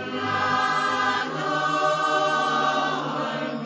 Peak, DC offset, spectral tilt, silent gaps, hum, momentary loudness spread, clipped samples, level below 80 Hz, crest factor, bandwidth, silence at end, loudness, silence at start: -10 dBFS; under 0.1%; -4 dB/octave; none; none; 5 LU; under 0.1%; -68 dBFS; 14 dB; 8 kHz; 0 s; -23 LUFS; 0 s